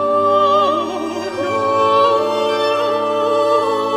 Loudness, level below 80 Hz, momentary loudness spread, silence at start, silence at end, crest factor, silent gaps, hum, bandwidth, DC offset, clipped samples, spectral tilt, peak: -16 LUFS; -60 dBFS; 8 LU; 0 s; 0 s; 12 dB; none; none; 14 kHz; under 0.1%; under 0.1%; -4.5 dB/octave; -2 dBFS